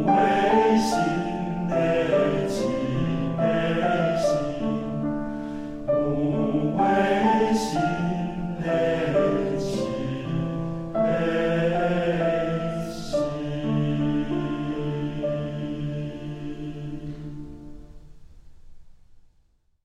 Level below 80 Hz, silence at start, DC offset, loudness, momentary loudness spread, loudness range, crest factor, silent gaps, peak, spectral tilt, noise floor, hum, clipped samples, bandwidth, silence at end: -46 dBFS; 0 s; under 0.1%; -25 LUFS; 12 LU; 10 LU; 18 dB; none; -8 dBFS; -7 dB/octave; -63 dBFS; none; under 0.1%; 14 kHz; 0.8 s